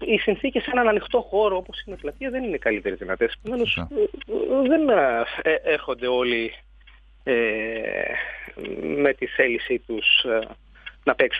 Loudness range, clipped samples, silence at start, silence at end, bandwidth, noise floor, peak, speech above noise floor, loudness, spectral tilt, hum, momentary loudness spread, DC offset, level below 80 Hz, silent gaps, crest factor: 3 LU; under 0.1%; 0 s; 0 s; 5 kHz; -50 dBFS; -4 dBFS; 27 dB; -23 LUFS; -6.5 dB/octave; none; 13 LU; under 0.1%; -48 dBFS; none; 20 dB